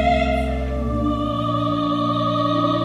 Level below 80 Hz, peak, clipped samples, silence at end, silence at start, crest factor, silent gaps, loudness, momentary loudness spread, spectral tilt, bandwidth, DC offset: -30 dBFS; -6 dBFS; under 0.1%; 0 s; 0 s; 14 dB; none; -21 LUFS; 4 LU; -7.5 dB/octave; 11.5 kHz; under 0.1%